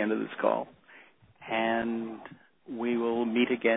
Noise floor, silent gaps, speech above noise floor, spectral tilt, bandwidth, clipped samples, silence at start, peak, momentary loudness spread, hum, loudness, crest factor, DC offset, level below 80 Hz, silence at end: -57 dBFS; none; 28 dB; -9 dB/octave; 4 kHz; under 0.1%; 0 s; -10 dBFS; 17 LU; none; -30 LUFS; 20 dB; under 0.1%; -70 dBFS; 0 s